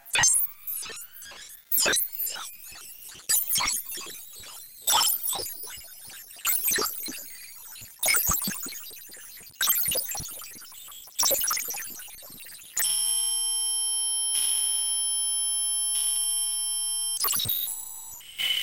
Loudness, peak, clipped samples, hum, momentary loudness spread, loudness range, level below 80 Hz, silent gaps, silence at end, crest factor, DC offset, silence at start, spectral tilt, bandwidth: -24 LUFS; -10 dBFS; under 0.1%; none; 19 LU; 4 LU; -58 dBFS; none; 0 s; 20 dB; 0.2%; 0.05 s; 1 dB/octave; 17.5 kHz